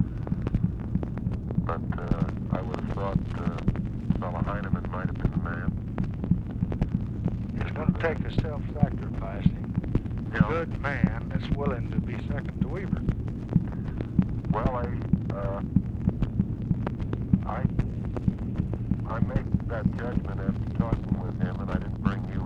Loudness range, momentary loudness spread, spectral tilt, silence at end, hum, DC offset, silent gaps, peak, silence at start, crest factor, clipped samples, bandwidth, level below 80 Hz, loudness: 2 LU; 4 LU; -9.5 dB/octave; 0 s; none; under 0.1%; none; -6 dBFS; 0 s; 22 dB; under 0.1%; 6.6 kHz; -36 dBFS; -29 LUFS